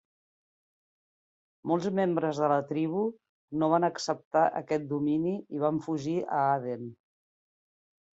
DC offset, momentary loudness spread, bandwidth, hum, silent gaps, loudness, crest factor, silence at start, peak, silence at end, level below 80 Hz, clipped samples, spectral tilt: under 0.1%; 7 LU; 8 kHz; none; 3.29-3.48 s, 4.25-4.31 s; -29 LUFS; 18 dB; 1.65 s; -12 dBFS; 1.2 s; -72 dBFS; under 0.1%; -6.5 dB/octave